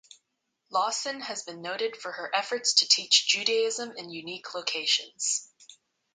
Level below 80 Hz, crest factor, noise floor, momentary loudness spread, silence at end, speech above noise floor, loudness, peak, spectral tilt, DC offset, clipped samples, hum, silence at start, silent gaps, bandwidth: -84 dBFS; 24 dB; -79 dBFS; 16 LU; 0.4 s; 51 dB; -26 LUFS; -6 dBFS; 0.5 dB/octave; under 0.1%; under 0.1%; none; 0.7 s; none; 9.6 kHz